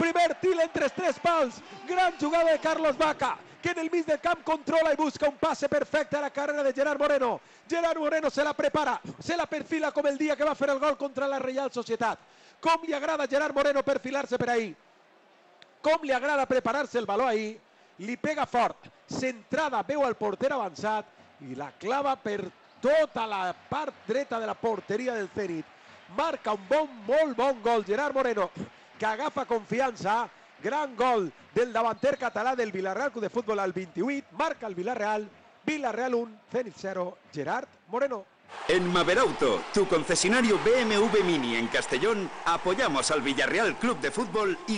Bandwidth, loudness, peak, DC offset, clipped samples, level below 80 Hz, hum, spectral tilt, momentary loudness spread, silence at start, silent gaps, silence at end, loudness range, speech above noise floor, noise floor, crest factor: 10 kHz; -28 LUFS; -14 dBFS; under 0.1%; under 0.1%; -62 dBFS; none; -4 dB/octave; 9 LU; 0 s; none; 0 s; 6 LU; 32 dB; -60 dBFS; 14 dB